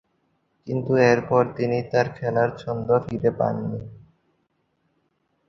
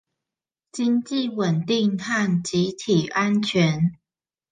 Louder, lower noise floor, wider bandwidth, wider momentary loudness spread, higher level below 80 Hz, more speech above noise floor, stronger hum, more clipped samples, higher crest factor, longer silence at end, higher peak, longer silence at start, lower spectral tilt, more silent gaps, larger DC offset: about the same, -23 LUFS vs -22 LUFS; second, -71 dBFS vs under -90 dBFS; second, 6.8 kHz vs 9.6 kHz; first, 13 LU vs 5 LU; about the same, -56 dBFS vs -60 dBFS; second, 49 dB vs over 68 dB; neither; neither; about the same, 20 dB vs 16 dB; first, 1.5 s vs 0.6 s; about the same, -4 dBFS vs -6 dBFS; about the same, 0.65 s vs 0.75 s; first, -7.5 dB/octave vs -5.5 dB/octave; neither; neither